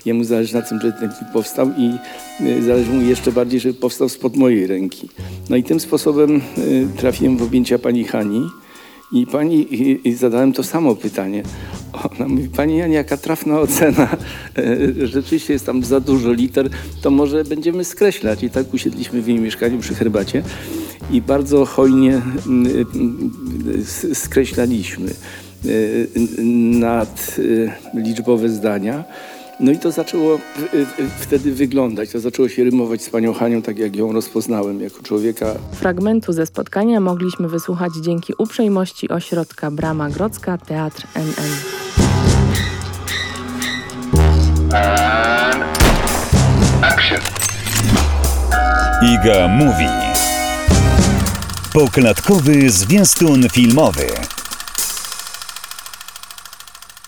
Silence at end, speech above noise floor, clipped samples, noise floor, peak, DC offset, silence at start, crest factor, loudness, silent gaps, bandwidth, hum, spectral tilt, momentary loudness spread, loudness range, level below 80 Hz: 0.3 s; 22 dB; under 0.1%; -38 dBFS; -2 dBFS; under 0.1%; 0.05 s; 14 dB; -16 LUFS; none; 20 kHz; none; -5 dB/octave; 12 LU; 6 LU; -28 dBFS